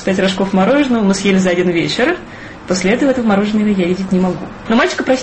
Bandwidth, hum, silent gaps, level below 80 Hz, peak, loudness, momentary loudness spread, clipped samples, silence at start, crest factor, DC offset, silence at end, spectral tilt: 8.8 kHz; none; none; -42 dBFS; -2 dBFS; -14 LUFS; 7 LU; under 0.1%; 0 s; 12 dB; under 0.1%; 0 s; -5.5 dB/octave